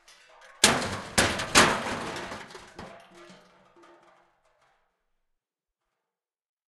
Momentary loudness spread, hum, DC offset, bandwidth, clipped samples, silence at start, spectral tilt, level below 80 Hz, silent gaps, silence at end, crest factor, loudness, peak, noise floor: 25 LU; none; under 0.1%; 12.5 kHz; under 0.1%; 0.6 s; -2 dB/octave; -54 dBFS; none; 3.45 s; 30 dB; -24 LUFS; 0 dBFS; -89 dBFS